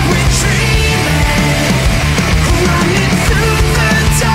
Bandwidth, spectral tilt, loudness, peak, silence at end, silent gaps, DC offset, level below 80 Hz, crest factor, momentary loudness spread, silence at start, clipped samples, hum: 16.5 kHz; -4.5 dB/octave; -11 LUFS; -2 dBFS; 0 s; none; under 0.1%; -18 dBFS; 8 dB; 1 LU; 0 s; under 0.1%; none